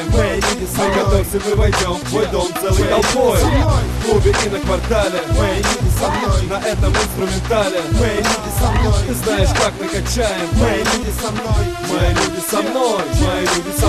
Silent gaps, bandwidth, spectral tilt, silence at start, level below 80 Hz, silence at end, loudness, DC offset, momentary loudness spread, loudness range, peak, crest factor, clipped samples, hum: none; 14.5 kHz; -4.5 dB/octave; 0 s; -22 dBFS; 0 s; -17 LUFS; under 0.1%; 4 LU; 2 LU; 0 dBFS; 14 dB; under 0.1%; none